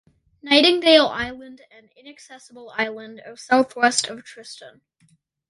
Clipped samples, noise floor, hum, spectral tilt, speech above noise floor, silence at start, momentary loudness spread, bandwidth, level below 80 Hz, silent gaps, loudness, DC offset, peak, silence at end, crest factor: under 0.1%; -62 dBFS; none; -2 dB/octave; 40 dB; 0.45 s; 25 LU; 11.5 kHz; -60 dBFS; none; -18 LUFS; under 0.1%; 0 dBFS; 0.8 s; 22 dB